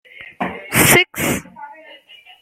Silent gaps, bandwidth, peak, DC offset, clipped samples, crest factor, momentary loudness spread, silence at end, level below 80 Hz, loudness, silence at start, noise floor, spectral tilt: none; 16.5 kHz; 0 dBFS; under 0.1%; under 0.1%; 20 dB; 26 LU; 0.7 s; -46 dBFS; -15 LUFS; 0.2 s; -44 dBFS; -3 dB/octave